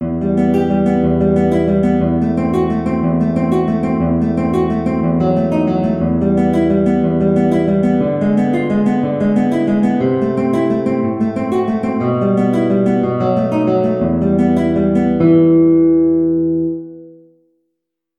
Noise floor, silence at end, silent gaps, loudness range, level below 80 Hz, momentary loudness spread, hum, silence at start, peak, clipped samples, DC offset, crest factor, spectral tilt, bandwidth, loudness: -75 dBFS; 1.05 s; none; 3 LU; -38 dBFS; 4 LU; none; 0 s; 0 dBFS; under 0.1%; under 0.1%; 14 dB; -9.5 dB/octave; 9.8 kHz; -15 LUFS